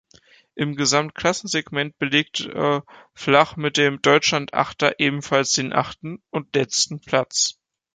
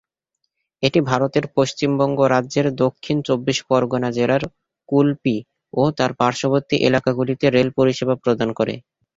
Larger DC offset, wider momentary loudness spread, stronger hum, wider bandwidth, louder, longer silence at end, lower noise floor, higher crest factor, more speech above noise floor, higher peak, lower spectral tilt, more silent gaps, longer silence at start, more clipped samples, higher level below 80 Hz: neither; first, 10 LU vs 6 LU; neither; first, 10 kHz vs 7.8 kHz; about the same, -21 LUFS vs -19 LUFS; about the same, 0.45 s vs 0.35 s; second, -54 dBFS vs -76 dBFS; about the same, 20 dB vs 18 dB; second, 33 dB vs 57 dB; about the same, -2 dBFS vs -2 dBFS; second, -3 dB/octave vs -6 dB/octave; neither; second, 0.55 s vs 0.8 s; neither; second, -60 dBFS vs -54 dBFS